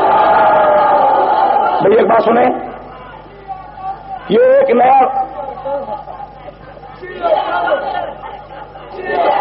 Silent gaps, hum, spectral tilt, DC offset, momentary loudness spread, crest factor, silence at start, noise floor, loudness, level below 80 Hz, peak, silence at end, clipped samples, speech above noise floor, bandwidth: none; none; -3 dB/octave; under 0.1%; 22 LU; 10 dB; 0 s; -34 dBFS; -12 LUFS; -46 dBFS; -2 dBFS; 0 s; under 0.1%; 22 dB; 5.4 kHz